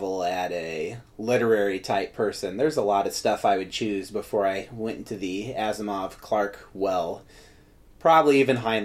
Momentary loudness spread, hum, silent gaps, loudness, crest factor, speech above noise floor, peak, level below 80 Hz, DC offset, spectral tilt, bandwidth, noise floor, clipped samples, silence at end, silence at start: 12 LU; none; none; -25 LUFS; 20 dB; 28 dB; -6 dBFS; -56 dBFS; under 0.1%; -5 dB/octave; 15.5 kHz; -53 dBFS; under 0.1%; 0 s; 0 s